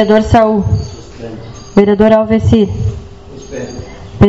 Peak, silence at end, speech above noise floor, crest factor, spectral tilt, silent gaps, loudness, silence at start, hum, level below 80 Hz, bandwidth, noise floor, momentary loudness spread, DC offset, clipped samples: 0 dBFS; 0 s; 22 dB; 12 dB; -7.5 dB/octave; none; -11 LUFS; 0 s; none; -28 dBFS; 8 kHz; -31 dBFS; 21 LU; 0.9%; 0.8%